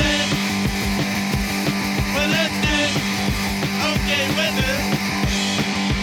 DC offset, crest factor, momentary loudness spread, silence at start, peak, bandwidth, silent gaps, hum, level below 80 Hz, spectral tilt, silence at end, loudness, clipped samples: under 0.1%; 14 dB; 3 LU; 0 s; -6 dBFS; 19 kHz; none; none; -32 dBFS; -4 dB/octave; 0 s; -20 LUFS; under 0.1%